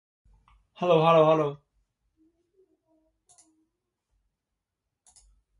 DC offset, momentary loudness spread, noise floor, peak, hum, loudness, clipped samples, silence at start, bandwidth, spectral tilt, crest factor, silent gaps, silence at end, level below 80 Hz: under 0.1%; 13 LU; -85 dBFS; -8 dBFS; none; -22 LUFS; under 0.1%; 0.8 s; 11 kHz; -7 dB/octave; 22 dB; none; 4.05 s; -68 dBFS